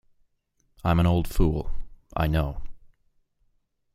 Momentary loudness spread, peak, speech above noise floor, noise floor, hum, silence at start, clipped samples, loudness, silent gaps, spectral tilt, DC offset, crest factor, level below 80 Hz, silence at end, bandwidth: 17 LU; -8 dBFS; 48 dB; -70 dBFS; none; 0.85 s; under 0.1%; -26 LUFS; none; -7.5 dB/octave; under 0.1%; 20 dB; -34 dBFS; 1.15 s; 15.5 kHz